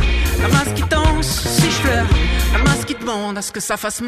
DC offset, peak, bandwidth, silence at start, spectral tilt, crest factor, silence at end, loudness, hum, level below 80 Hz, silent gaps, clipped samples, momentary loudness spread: under 0.1%; -4 dBFS; 15.5 kHz; 0 s; -4.5 dB/octave; 14 dB; 0 s; -17 LUFS; none; -20 dBFS; none; under 0.1%; 7 LU